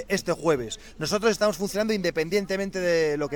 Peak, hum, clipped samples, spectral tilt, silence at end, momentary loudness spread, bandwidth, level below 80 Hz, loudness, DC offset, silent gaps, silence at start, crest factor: -10 dBFS; none; under 0.1%; -4.5 dB/octave; 0 s; 5 LU; 19 kHz; -50 dBFS; -25 LUFS; 0.2%; none; 0 s; 16 dB